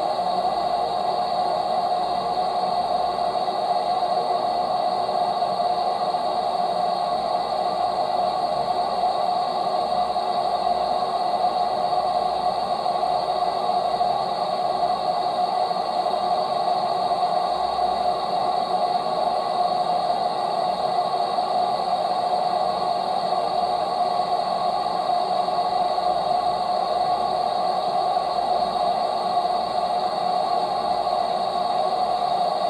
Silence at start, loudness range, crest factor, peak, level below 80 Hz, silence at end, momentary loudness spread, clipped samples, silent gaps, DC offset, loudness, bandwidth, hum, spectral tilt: 0 s; 1 LU; 12 dB; -10 dBFS; -58 dBFS; 0 s; 1 LU; under 0.1%; none; under 0.1%; -23 LUFS; 12 kHz; none; -4.5 dB/octave